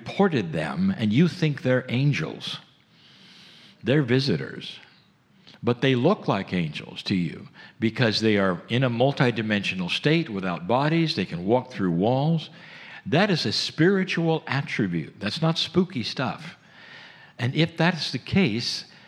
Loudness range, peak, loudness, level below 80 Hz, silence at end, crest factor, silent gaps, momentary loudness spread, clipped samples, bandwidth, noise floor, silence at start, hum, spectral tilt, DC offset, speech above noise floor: 4 LU; -4 dBFS; -24 LUFS; -62 dBFS; 0.25 s; 20 dB; none; 11 LU; under 0.1%; 11 kHz; -58 dBFS; 0 s; none; -6 dB/octave; under 0.1%; 35 dB